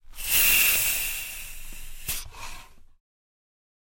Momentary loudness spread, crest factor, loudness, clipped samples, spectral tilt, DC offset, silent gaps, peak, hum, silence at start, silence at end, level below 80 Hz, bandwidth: 24 LU; 22 dB; -21 LUFS; under 0.1%; 1 dB/octave; under 0.1%; none; -6 dBFS; none; 0.05 s; 1.2 s; -42 dBFS; 17 kHz